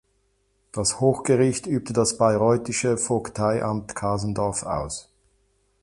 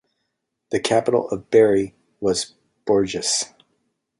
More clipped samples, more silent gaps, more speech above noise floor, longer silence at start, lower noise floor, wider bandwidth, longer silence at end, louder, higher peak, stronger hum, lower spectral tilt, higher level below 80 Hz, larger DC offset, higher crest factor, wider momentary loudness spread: neither; neither; second, 45 dB vs 57 dB; about the same, 0.75 s vs 0.7 s; second, -68 dBFS vs -77 dBFS; about the same, 11.5 kHz vs 11.5 kHz; about the same, 0.8 s vs 0.75 s; second, -23 LUFS vs -20 LUFS; about the same, -6 dBFS vs -4 dBFS; neither; first, -5 dB/octave vs -3.5 dB/octave; first, -50 dBFS vs -56 dBFS; neither; about the same, 18 dB vs 18 dB; second, 8 LU vs 15 LU